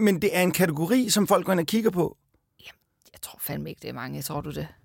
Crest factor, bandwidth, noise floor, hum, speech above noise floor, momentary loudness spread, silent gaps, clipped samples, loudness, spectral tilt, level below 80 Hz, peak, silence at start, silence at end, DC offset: 18 dB; 17 kHz; -57 dBFS; none; 32 dB; 14 LU; none; under 0.1%; -25 LUFS; -4.5 dB/octave; -56 dBFS; -8 dBFS; 0 s; 0.15 s; under 0.1%